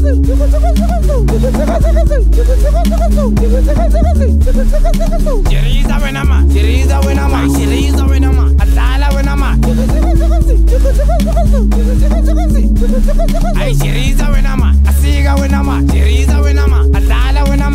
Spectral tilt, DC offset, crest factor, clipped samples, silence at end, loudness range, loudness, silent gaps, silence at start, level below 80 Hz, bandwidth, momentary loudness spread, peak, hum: -6.5 dB/octave; under 0.1%; 8 dB; under 0.1%; 0 s; 1 LU; -12 LUFS; none; 0 s; -10 dBFS; 15 kHz; 3 LU; 0 dBFS; none